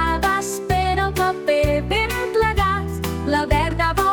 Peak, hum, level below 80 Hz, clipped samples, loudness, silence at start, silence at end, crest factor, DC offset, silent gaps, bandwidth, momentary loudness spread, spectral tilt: -6 dBFS; none; -30 dBFS; under 0.1%; -20 LUFS; 0 s; 0 s; 14 dB; under 0.1%; none; 19.5 kHz; 4 LU; -5 dB/octave